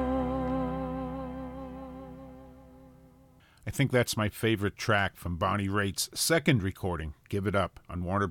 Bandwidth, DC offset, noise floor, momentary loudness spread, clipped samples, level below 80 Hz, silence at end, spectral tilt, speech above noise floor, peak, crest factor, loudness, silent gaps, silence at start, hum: 17.5 kHz; under 0.1%; -59 dBFS; 17 LU; under 0.1%; -48 dBFS; 0 s; -5 dB/octave; 30 dB; -8 dBFS; 22 dB; -30 LUFS; none; 0 s; none